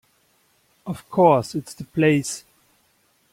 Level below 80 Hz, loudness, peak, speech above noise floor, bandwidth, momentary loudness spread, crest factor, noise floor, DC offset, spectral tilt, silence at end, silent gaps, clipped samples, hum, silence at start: -62 dBFS; -21 LUFS; -2 dBFS; 43 dB; 16.5 kHz; 17 LU; 20 dB; -64 dBFS; under 0.1%; -6 dB/octave; 0.95 s; none; under 0.1%; none; 0.85 s